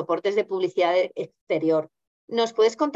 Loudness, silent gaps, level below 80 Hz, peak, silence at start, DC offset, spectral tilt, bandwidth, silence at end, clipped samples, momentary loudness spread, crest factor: -24 LUFS; 1.41-1.47 s, 2.07-2.28 s; -76 dBFS; -10 dBFS; 0 s; under 0.1%; -5 dB/octave; 8 kHz; 0 s; under 0.1%; 8 LU; 14 dB